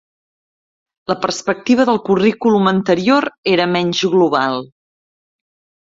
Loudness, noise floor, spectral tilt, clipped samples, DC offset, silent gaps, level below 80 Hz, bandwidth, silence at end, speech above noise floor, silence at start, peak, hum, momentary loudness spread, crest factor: -15 LUFS; under -90 dBFS; -5.5 dB/octave; under 0.1%; under 0.1%; 3.38-3.43 s; -56 dBFS; 7.8 kHz; 1.3 s; over 75 dB; 1.1 s; -2 dBFS; none; 7 LU; 16 dB